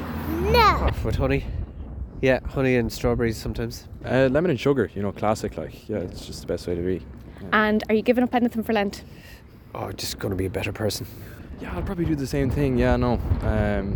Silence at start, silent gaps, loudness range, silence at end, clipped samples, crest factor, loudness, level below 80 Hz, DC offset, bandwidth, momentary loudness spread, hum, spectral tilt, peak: 0 s; none; 5 LU; 0 s; under 0.1%; 20 dB; -24 LUFS; -34 dBFS; under 0.1%; 19.5 kHz; 15 LU; none; -6 dB/octave; -4 dBFS